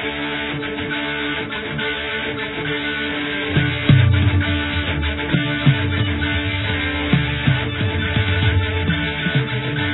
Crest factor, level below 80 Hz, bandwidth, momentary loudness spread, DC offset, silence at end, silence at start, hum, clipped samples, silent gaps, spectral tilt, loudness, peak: 18 dB; -34 dBFS; 4.1 kHz; 6 LU; under 0.1%; 0 s; 0 s; none; under 0.1%; none; -9.5 dB/octave; -19 LUFS; -2 dBFS